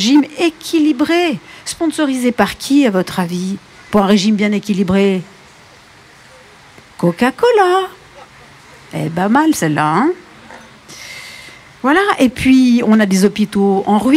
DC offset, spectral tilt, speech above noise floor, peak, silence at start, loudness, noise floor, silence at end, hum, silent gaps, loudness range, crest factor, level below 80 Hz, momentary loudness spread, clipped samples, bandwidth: under 0.1%; -5.5 dB/octave; 30 dB; 0 dBFS; 0 s; -14 LUFS; -42 dBFS; 0 s; none; none; 4 LU; 14 dB; -48 dBFS; 15 LU; under 0.1%; 15.5 kHz